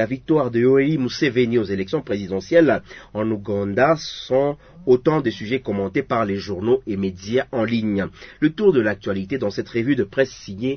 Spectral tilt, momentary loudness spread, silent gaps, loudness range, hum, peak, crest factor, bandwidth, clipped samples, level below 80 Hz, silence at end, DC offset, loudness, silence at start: -7 dB/octave; 8 LU; none; 2 LU; none; -2 dBFS; 18 dB; 6.6 kHz; under 0.1%; -52 dBFS; 0 s; under 0.1%; -21 LUFS; 0 s